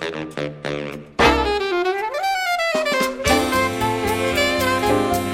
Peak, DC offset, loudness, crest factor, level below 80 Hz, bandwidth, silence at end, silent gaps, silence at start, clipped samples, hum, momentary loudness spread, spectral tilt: -2 dBFS; under 0.1%; -20 LUFS; 18 dB; -38 dBFS; 16.5 kHz; 0 s; none; 0 s; under 0.1%; none; 10 LU; -4 dB/octave